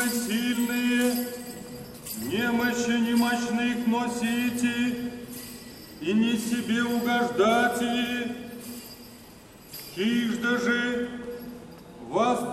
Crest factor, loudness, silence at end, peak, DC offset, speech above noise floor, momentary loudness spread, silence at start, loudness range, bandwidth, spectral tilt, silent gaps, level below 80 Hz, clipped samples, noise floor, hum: 16 dB; -26 LUFS; 0 s; -10 dBFS; under 0.1%; 24 dB; 17 LU; 0 s; 4 LU; 15.5 kHz; -4 dB/octave; none; -60 dBFS; under 0.1%; -48 dBFS; none